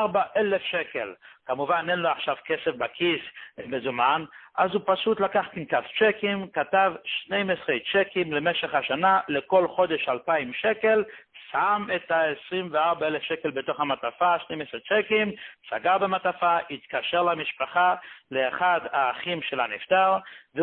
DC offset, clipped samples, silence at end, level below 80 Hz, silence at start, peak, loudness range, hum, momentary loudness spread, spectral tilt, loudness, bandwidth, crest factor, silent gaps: under 0.1%; under 0.1%; 0 s; -68 dBFS; 0 s; -8 dBFS; 2 LU; none; 9 LU; -9 dB/octave; -25 LUFS; 4.4 kHz; 18 dB; none